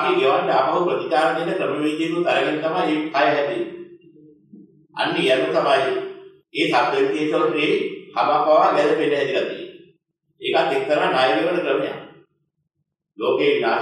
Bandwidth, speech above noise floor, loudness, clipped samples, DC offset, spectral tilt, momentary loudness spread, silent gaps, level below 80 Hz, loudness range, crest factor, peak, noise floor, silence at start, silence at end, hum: 12 kHz; 57 dB; -20 LUFS; under 0.1%; under 0.1%; -5 dB/octave; 10 LU; none; -78 dBFS; 3 LU; 16 dB; -4 dBFS; -76 dBFS; 0 s; 0 s; none